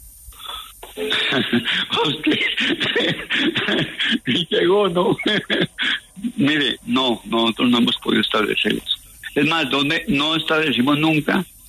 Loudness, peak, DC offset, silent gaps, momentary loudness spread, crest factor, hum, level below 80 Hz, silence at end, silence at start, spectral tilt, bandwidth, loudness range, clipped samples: -19 LUFS; -4 dBFS; under 0.1%; none; 7 LU; 14 dB; none; -52 dBFS; 0.2 s; 0 s; -4.5 dB/octave; 13.5 kHz; 1 LU; under 0.1%